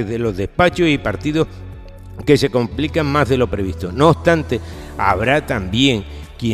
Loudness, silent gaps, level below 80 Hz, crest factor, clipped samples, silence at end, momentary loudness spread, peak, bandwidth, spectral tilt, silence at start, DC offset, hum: -17 LUFS; none; -34 dBFS; 18 dB; under 0.1%; 0 s; 11 LU; 0 dBFS; 15 kHz; -6 dB/octave; 0 s; under 0.1%; none